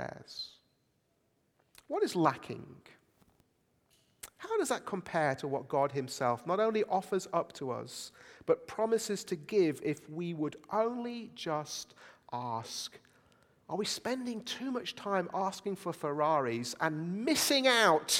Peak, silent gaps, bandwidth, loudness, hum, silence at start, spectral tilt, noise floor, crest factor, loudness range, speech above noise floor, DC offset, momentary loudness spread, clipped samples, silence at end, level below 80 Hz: -12 dBFS; none; 17.5 kHz; -33 LUFS; none; 0 s; -3.5 dB/octave; -75 dBFS; 22 dB; 6 LU; 42 dB; under 0.1%; 14 LU; under 0.1%; 0 s; -76 dBFS